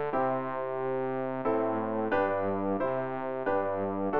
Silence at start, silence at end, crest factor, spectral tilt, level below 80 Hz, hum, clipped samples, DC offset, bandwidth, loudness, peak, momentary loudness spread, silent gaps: 0 s; 0 s; 14 dB; -10 dB/octave; -64 dBFS; none; under 0.1%; 0.4%; 5.2 kHz; -31 LUFS; -16 dBFS; 4 LU; none